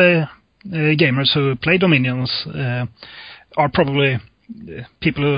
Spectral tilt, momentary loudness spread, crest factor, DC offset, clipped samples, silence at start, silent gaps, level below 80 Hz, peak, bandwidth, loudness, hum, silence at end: -10.5 dB/octave; 20 LU; 18 dB; under 0.1%; under 0.1%; 0 s; none; -48 dBFS; 0 dBFS; 5.2 kHz; -18 LUFS; none; 0 s